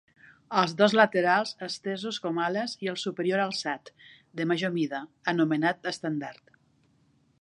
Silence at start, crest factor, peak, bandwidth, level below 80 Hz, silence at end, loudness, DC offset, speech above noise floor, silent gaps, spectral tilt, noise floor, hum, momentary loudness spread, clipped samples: 0.5 s; 24 dB; -6 dBFS; 11 kHz; -78 dBFS; 1.1 s; -28 LUFS; under 0.1%; 38 dB; none; -5 dB/octave; -66 dBFS; none; 12 LU; under 0.1%